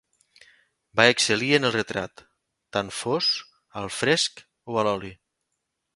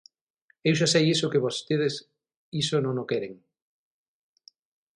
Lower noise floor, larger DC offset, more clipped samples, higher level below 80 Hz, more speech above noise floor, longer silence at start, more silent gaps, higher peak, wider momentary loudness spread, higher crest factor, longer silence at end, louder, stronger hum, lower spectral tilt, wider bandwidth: first, -80 dBFS vs -68 dBFS; neither; neither; first, -62 dBFS vs -68 dBFS; first, 56 dB vs 43 dB; first, 0.95 s vs 0.65 s; second, none vs 2.36-2.52 s; first, 0 dBFS vs -8 dBFS; first, 14 LU vs 11 LU; first, 26 dB vs 20 dB; second, 0.8 s vs 1.6 s; about the same, -23 LUFS vs -25 LUFS; neither; second, -3 dB/octave vs -4.5 dB/octave; about the same, 11.5 kHz vs 11.5 kHz